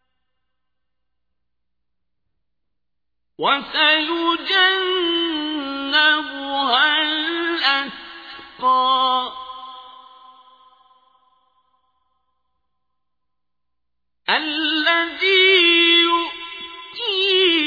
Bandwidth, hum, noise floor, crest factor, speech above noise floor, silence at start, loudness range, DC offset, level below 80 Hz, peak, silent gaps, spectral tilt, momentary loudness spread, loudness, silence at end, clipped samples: 5 kHz; 60 Hz at -75 dBFS; -83 dBFS; 18 dB; 65 dB; 3.4 s; 10 LU; under 0.1%; -64 dBFS; -2 dBFS; none; -3 dB/octave; 20 LU; -17 LUFS; 0 s; under 0.1%